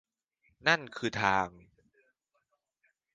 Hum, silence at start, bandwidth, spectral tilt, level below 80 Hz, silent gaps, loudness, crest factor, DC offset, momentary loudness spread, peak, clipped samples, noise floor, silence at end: none; 0.65 s; 10 kHz; -4 dB/octave; -64 dBFS; none; -30 LUFS; 26 dB; under 0.1%; 7 LU; -10 dBFS; under 0.1%; -79 dBFS; 1.65 s